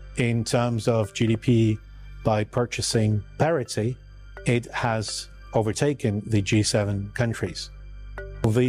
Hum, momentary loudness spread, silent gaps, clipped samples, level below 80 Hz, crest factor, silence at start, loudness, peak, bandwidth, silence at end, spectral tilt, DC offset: 50 Hz at -50 dBFS; 11 LU; none; under 0.1%; -44 dBFS; 16 dB; 0 s; -25 LUFS; -8 dBFS; 14 kHz; 0 s; -5.5 dB/octave; under 0.1%